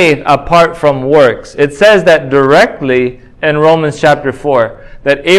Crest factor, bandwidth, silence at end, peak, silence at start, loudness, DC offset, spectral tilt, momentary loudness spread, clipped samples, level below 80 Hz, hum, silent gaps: 8 dB; 14 kHz; 0 s; 0 dBFS; 0 s; -9 LUFS; under 0.1%; -5.5 dB/octave; 7 LU; 2%; -38 dBFS; none; none